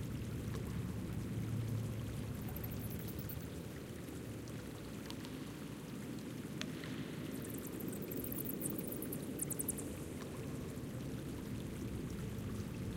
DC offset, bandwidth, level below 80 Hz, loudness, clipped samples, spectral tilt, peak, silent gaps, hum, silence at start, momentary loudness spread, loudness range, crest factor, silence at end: under 0.1%; 17 kHz; -56 dBFS; -44 LUFS; under 0.1%; -5.5 dB/octave; -20 dBFS; none; none; 0 s; 7 LU; 4 LU; 24 dB; 0 s